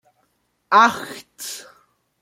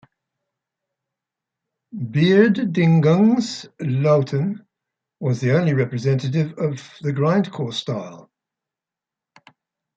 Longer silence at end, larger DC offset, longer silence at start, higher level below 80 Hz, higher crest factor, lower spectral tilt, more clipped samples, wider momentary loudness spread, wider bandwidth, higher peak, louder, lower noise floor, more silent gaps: second, 0.6 s vs 1.8 s; neither; second, 0.7 s vs 1.95 s; about the same, -68 dBFS vs -64 dBFS; about the same, 22 dB vs 18 dB; second, -2 dB/octave vs -7.5 dB/octave; neither; first, 20 LU vs 13 LU; first, 16.5 kHz vs 7.8 kHz; about the same, -2 dBFS vs -2 dBFS; first, -16 LUFS vs -20 LUFS; second, -68 dBFS vs -88 dBFS; neither